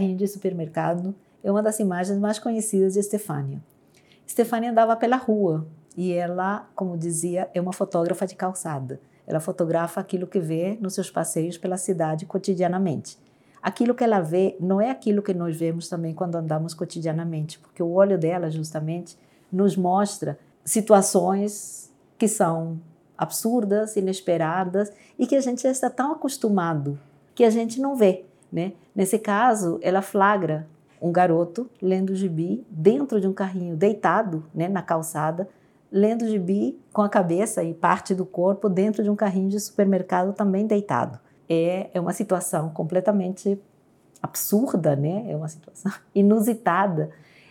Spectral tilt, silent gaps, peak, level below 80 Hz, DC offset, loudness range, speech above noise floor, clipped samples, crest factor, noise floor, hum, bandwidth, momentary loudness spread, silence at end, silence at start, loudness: -6 dB/octave; none; -2 dBFS; -78 dBFS; under 0.1%; 4 LU; 34 dB; under 0.1%; 22 dB; -57 dBFS; none; 18 kHz; 11 LU; 0.4 s; 0 s; -24 LUFS